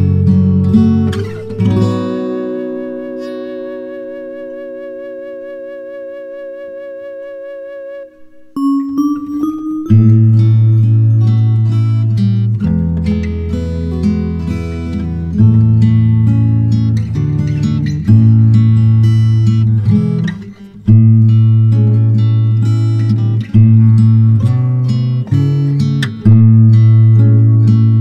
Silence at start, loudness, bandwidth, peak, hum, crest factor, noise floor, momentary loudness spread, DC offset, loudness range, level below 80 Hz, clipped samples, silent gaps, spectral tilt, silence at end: 0 s; -11 LUFS; 5.6 kHz; 0 dBFS; none; 10 dB; -36 dBFS; 19 LU; under 0.1%; 15 LU; -34 dBFS; under 0.1%; none; -10 dB/octave; 0 s